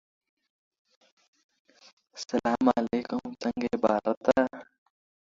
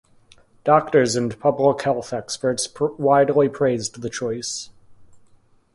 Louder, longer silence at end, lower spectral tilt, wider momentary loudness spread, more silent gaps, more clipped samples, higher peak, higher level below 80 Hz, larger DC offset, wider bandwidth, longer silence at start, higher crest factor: second, -28 LUFS vs -21 LUFS; about the same, 0.7 s vs 0.6 s; about the same, -5.5 dB/octave vs -4.5 dB/octave; about the same, 12 LU vs 12 LU; first, 4.17-4.21 s vs none; neither; second, -8 dBFS vs -2 dBFS; second, -64 dBFS vs -58 dBFS; neither; second, 7.6 kHz vs 11.5 kHz; first, 2.15 s vs 0.65 s; about the same, 24 dB vs 20 dB